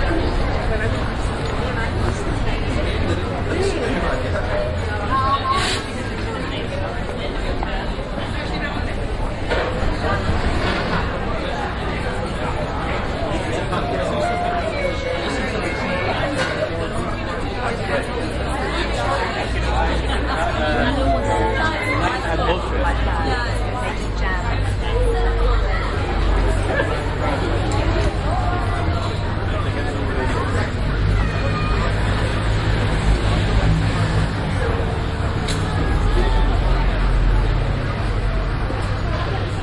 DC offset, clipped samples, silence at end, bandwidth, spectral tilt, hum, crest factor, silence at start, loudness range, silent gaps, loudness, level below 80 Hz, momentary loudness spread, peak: under 0.1%; under 0.1%; 0 s; 11.5 kHz; -6 dB/octave; none; 14 dB; 0 s; 3 LU; none; -21 LUFS; -24 dBFS; 5 LU; -4 dBFS